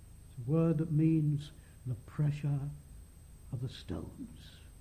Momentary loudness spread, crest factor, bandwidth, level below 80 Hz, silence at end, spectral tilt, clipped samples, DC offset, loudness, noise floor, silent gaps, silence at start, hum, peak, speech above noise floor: 22 LU; 16 dB; 14.5 kHz; -54 dBFS; 0 s; -8.5 dB/octave; under 0.1%; under 0.1%; -34 LUFS; -53 dBFS; none; 0 s; none; -20 dBFS; 20 dB